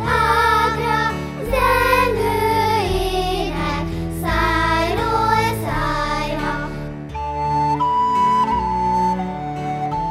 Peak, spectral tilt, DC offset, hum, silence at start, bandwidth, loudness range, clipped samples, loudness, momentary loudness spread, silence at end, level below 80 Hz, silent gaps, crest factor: -2 dBFS; -5.5 dB/octave; under 0.1%; none; 0 s; 16 kHz; 2 LU; under 0.1%; -19 LUFS; 9 LU; 0 s; -32 dBFS; none; 16 dB